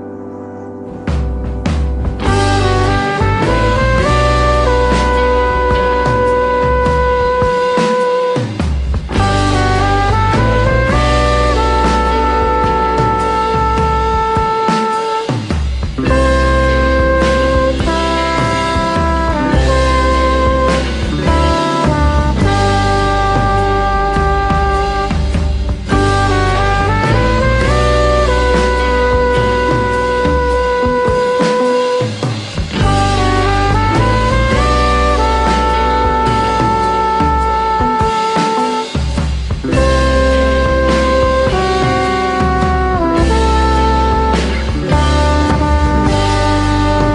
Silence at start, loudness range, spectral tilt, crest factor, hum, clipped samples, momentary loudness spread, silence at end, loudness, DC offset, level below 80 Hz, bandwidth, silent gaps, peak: 0 s; 2 LU; -6 dB/octave; 12 dB; none; under 0.1%; 5 LU; 0 s; -13 LUFS; under 0.1%; -18 dBFS; 10.5 kHz; none; 0 dBFS